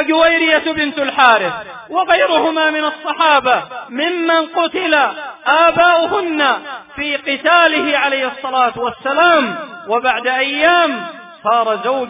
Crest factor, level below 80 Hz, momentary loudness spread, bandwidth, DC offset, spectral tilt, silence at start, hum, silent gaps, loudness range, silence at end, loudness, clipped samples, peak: 14 dB; -54 dBFS; 11 LU; 3.9 kHz; under 0.1%; -6.5 dB/octave; 0 s; none; none; 1 LU; 0 s; -14 LUFS; under 0.1%; 0 dBFS